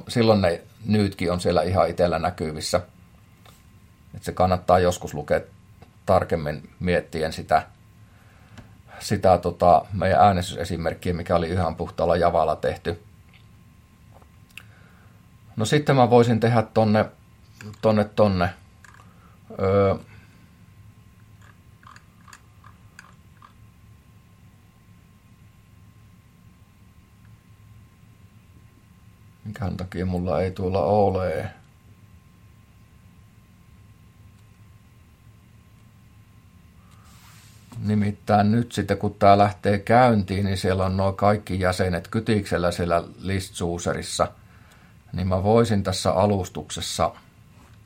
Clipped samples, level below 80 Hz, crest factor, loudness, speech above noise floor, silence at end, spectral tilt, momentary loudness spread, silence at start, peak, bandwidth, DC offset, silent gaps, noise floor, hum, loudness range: under 0.1%; -54 dBFS; 22 dB; -22 LUFS; 31 dB; 0.7 s; -6 dB/octave; 13 LU; 0.05 s; -2 dBFS; 16.5 kHz; under 0.1%; none; -52 dBFS; none; 8 LU